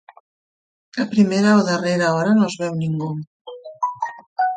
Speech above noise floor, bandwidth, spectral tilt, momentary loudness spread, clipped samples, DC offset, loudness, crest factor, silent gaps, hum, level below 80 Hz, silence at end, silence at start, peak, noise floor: over 72 dB; 9.2 kHz; -6 dB/octave; 16 LU; under 0.1%; under 0.1%; -19 LUFS; 16 dB; 3.27-3.45 s, 4.26-4.36 s; none; -64 dBFS; 0 s; 0.95 s; -4 dBFS; under -90 dBFS